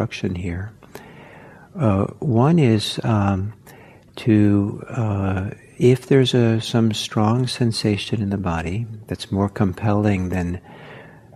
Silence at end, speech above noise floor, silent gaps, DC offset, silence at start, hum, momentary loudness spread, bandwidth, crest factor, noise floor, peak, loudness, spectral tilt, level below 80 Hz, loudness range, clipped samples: 0.25 s; 26 dB; none; under 0.1%; 0 s; none; 15 LU; 13.5 kHz; 18 dB; -45 dBFS; -2 dBFS; -20 LUFS; -7 dB/octave; -52 dBFS; 3 LU; under 0.1%